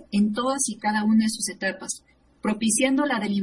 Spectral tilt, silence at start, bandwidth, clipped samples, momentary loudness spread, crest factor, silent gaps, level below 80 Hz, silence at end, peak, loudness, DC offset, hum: -3.5 dB/octave; 0 s; 11.5 kHz; under 0.1%; 11 LU; 16 dB; none; -60 dBFS; 0 s; -8 dBFS; -24 LUFS; under 0.1%; none